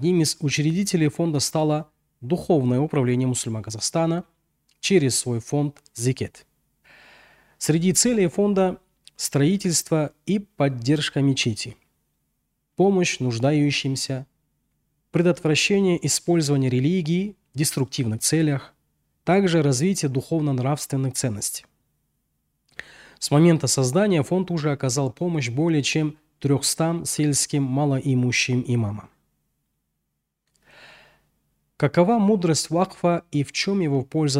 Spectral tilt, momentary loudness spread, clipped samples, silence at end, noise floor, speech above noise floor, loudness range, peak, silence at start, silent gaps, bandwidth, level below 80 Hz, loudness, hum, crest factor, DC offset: -5 dB/octave; 9 LU; under 0.1%; 0 s; -78 dBFS; 56 dB; 4 LU; -6 dBFS; 0 s; none; 16 kHz; -60 dBFS; -22 LUFS; none; 18 dB; under 0.1%